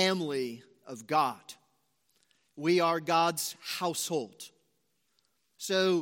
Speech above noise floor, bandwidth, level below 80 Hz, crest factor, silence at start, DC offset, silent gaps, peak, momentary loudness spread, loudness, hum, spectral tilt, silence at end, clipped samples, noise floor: 47 dB; 16.5 kHz; -84 dBFS; 20 dB; 0 s; under 0.1%; none; -12 dBFS; 20 LU; -30 LUFS; none; -3.5 dB/octave; 0 s; under 0.1%; -77 dBFS